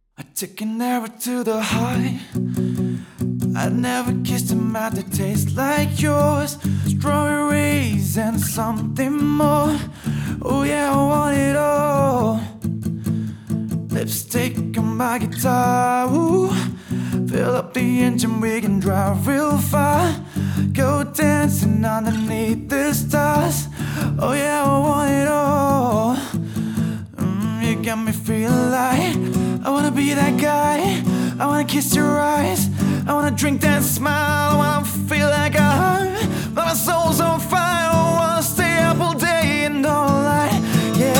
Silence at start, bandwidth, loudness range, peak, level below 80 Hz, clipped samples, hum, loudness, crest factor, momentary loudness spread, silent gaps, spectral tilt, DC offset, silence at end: 0.2 s; 18.5 kHz; 4 LU; -2 dBFS; -48 dBFS; under 0.1%; none; -19 LUFS; 16 dB; 7 LU; none; -5.5 dB/octave; under 0.1%; 0 s